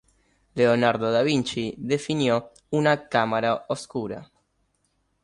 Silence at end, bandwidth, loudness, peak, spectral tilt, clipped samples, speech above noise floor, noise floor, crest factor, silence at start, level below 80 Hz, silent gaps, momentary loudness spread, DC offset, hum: 1 s; 11.5 kHz; -24 LUFS; -6 dBFS; -5.5 dB/octave; under 0.1%; 47 dB; -71 dBFS; 18 dB; 0.55 s; -62 dBFS; none; 10 LU; under 0.1%; none